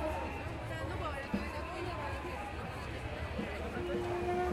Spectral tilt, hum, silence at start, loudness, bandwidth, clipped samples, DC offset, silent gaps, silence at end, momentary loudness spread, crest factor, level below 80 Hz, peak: -6.5 dB/octave; none; 0 s; -39 LUFS; 15.5 kHz; under 0.1%; under 0.1%; none; 0 s; 5 LU; 16 dB; -48 dBFS; -22 dBFS